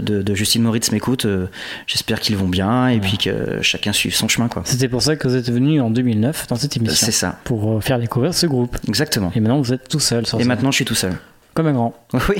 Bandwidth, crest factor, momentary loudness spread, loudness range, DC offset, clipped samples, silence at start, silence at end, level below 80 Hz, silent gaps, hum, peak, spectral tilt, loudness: 17 kHz; 16 dB; 5 LU; 1 LU; under 0.1%; under 0.1%; 0 s; 0 s; -40 dBFS; none; none; -2 dBFS; -4.5 dB/octave; -18 LUFS